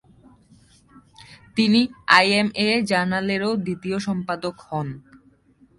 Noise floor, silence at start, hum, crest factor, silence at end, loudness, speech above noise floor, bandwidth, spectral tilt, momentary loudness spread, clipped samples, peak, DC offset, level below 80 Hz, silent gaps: -56 dBFS; 1.3 s; none; 24 dB; 0.8 s; -21 LUFS; 35 dB; 11.5 kHz; -5 dB/octave; 14 LU; under 0.1%; 0 dBFS; under 0.1%; -60 dBFS; none